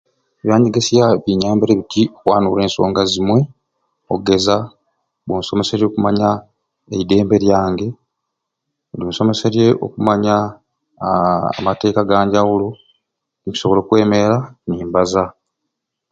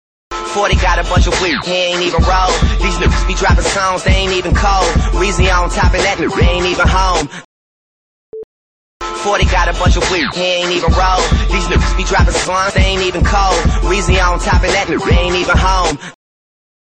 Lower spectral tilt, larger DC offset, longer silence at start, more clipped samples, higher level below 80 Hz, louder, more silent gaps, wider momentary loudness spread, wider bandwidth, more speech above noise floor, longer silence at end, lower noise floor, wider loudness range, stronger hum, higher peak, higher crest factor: first, -6 dB/octave vs -4.5 dB/octave; neither; first, 0.45 s vs 0.3 s; neither; second, -46 dBFS vs -16 dBFS; second, -16 LUFS vs -13 LUFS; second, none vs 7.45-8.32 s, 8.44-9.00 s; first, 11 LU vs 6 LU; about the same, 8.6 kHz vs 9.4 kHz; second, 62 dB vs over 78 dB; about the same, 0.8 s vs 0.7 s; second, -77 dBFS vs under -90 dBFS; about the same, 3 LU vs 4 LU; neither; about the same, 0 dBFS vs -2 dBFS; about the same, 16 dB vs 12 dB